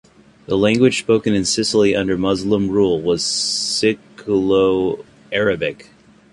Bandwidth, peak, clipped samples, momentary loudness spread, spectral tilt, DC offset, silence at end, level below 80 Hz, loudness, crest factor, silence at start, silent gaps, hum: 11.5 kHz; -2 dBFS; under 0.1%; 8 LU; -4 dB/octave; under 0.1%; 0.5 s; -48 dBFS; -17 LUFS; 16 dB; 0.5 s; none; none